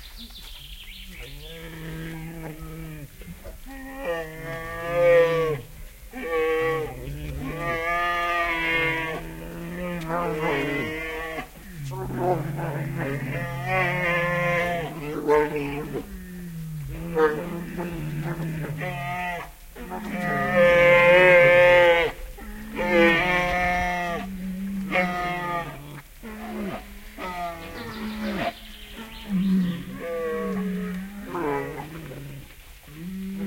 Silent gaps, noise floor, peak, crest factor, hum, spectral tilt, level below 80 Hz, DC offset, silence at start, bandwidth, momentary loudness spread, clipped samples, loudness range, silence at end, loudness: none; -45 dBFS; -4 dBFS; 22 dB; none; -6 dB/octave; -44 dBFS; under 0.1%; 0 s; 16.5 kHz; 22 LU; under 0.1%; 15 LU; 0 s; -24 LUFS